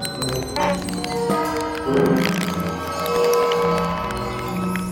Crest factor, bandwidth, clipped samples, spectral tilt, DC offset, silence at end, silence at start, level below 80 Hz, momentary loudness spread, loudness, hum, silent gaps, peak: 16 dB; 17 kHz; under 0.1%; -5 dB/octave; under 0.1%; 0 s; 0 s; -42 dBFS; 7 LU; -21 LUFS; none; none; -4 dBFS